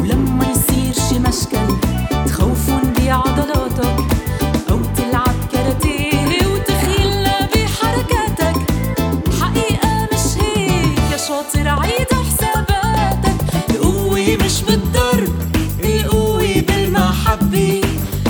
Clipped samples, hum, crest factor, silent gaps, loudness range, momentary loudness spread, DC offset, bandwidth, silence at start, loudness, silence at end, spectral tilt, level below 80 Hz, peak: under 0.1%; none; 14 dB; none; 1 LU; 3 LU; under 0.1%; over 20 kHz; 0 s; -16 LUFS; 0 s; -5 dB/octave; -22 dBFS; 0 dBFS